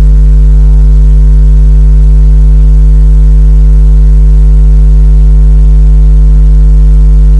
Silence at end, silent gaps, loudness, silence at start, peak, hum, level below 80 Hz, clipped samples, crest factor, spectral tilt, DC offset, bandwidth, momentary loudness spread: 0 s; none; -6 LUFS; 0 s; 0 dBFS; none; -2 dBFS; 0.3%; 2 dB; -9.5 dB/octave; 0.1%; 1.5 kHz; 0 LU